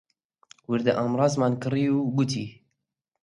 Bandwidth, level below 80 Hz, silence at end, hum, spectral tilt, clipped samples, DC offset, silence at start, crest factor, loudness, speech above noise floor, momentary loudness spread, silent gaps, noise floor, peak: 11.5 kHz; -66 dBFS; 0.7 s; none; -6.5 dB/octave; under 0.1%; under 0.1%; 0.7 s; 18 dB; -25 LUFS; 58 dB; 7 LU; none; -82 dBFS; -8 dBFS